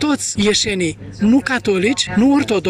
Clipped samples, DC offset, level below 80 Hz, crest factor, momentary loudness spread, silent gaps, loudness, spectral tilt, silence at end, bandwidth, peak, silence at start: under 0.1%; under 0.1%; -44 dBFS; 14 dB; 5 LU; none; -16 LUFS; -4 dB/octave; 0 s; 13 kHz; -2 dBFS; 0 s